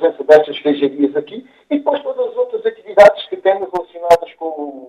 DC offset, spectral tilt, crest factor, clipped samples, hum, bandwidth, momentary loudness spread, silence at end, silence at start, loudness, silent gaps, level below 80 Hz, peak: under 0.1%; -5 dB/octave; 14 dB; 0.4%; none; 12.5 kHz; 15 LU; 0.05 s; 0 s; -15 LUFS; none; -54 dBFS; 0 dBFS